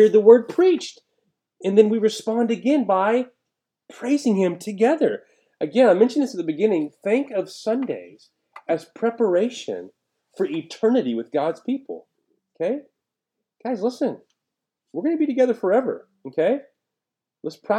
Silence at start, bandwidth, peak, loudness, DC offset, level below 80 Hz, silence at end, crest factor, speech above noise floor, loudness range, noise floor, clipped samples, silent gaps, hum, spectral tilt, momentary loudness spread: 0 s; 11 kHz; -2 dBFS; -21 LUFS; under 0.1%; -86 dBFS; 0 s; 20 dB; 66 dB; 6 LU; -86 dBFS; under 0.1%; none; none; -6 dB/octave; 16 LU